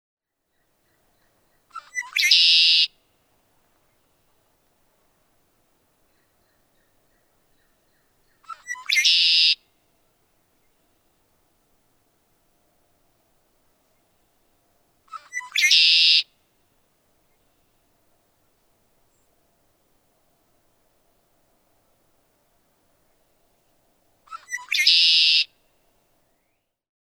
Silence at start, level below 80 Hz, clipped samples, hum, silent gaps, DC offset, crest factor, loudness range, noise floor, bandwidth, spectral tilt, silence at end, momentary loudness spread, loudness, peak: 1.75 s; -74 dBFS; under 0.1%; none; none; under 0.1%; 24 dB; 8 LU; -73 dBFS; over 20 kHz; 5 dB/octave; 1.6 s; 29 LU; -16 LUFS; -4 dBFS